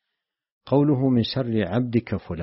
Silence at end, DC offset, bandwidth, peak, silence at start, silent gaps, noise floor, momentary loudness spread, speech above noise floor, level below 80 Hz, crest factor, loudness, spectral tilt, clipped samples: 0 s; under 0.1%; 5.8 kHz; -6 dBFS; 0.65 s; none; -83 dBFS; 5 LU; 61 dB; -52 dBFS; 16 dB; -23 LUFS; -7 dB/octave; under 0.1%